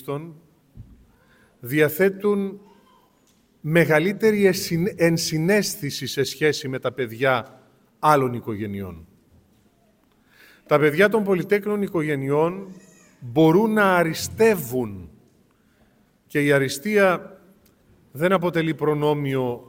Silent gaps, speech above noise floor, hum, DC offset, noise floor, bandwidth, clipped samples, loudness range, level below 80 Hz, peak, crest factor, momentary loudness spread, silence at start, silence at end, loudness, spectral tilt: none; 40 dB; none; under 0.1%; -61 dBFS; 17 kHz; under 0.1%; 4 LU; -58 dBFS; -2 dBFS; 20 dB; 13 LU; 0 s; 0.1 s; -21 LUFS; -5.5 dB/octave